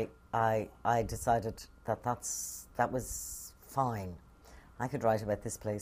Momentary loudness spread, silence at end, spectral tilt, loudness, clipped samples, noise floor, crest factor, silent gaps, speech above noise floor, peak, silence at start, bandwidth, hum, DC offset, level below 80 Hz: 11 LU; 0 s; -5 dB/octave; -35 LUFS; under 0.1%; -56 dBFS; 20 dB; none; 22 dB; -16 dBFS; 0 s; 15.5 kHz; none; under 0.1%; -54 dBFS